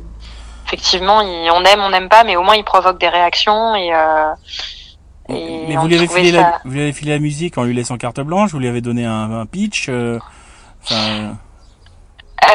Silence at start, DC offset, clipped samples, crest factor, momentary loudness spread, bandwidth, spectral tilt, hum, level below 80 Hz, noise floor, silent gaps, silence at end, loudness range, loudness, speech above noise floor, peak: 0 s; under 0.1%; under 0.1%; 14 dB; 15 LU; 16 kHz; -4.5 dB/octave; none; -40 dBFS; -43 dBFS; none; 0 s; 9 LU; -14 LUFS; 29 dB; 0 dBFS